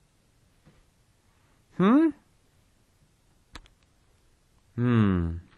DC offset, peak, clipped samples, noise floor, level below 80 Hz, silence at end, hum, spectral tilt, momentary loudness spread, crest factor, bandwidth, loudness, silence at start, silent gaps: under 0.1%; -10 dBFS; under 0.1%; -64 dBFS; -52 dBFS; 0.15 s; none; -9 dB/octave; 15 LU; 20 dB; 10 kHz; -24 LUFS; 1.8 s; none